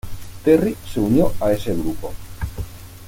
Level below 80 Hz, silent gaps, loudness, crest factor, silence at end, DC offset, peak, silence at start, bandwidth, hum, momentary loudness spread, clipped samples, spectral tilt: -34 dBFS; none; -20 LUFS; 18 dB; 0 s; under 0.1%; -2 dBFS; 0.05 s; 17 kHz; none; 17 LU; under 0.1%; -7 dB/octave